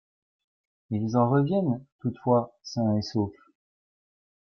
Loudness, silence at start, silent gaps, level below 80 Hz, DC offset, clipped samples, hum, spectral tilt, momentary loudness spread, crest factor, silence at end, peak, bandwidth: -27 LUFS; 0.9 s; 1.92-1.99 s; -66 dBFS; under 0.1%; under 0.1%; none; -8 dB/octave; 11 LU; 18 dB; 1.15 s; -10 dBFS; 7 kHz